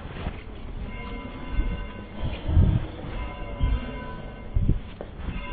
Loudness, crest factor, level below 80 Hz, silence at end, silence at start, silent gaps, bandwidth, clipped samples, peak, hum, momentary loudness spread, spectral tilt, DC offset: -30 LUFS; 20 dB; -30 dBFS; 0 s; 0 s; none; 4.6 kHz; under 0.1%; -8 dBFS; none; 14 LU; -11.5 dB/octave; under 0.1%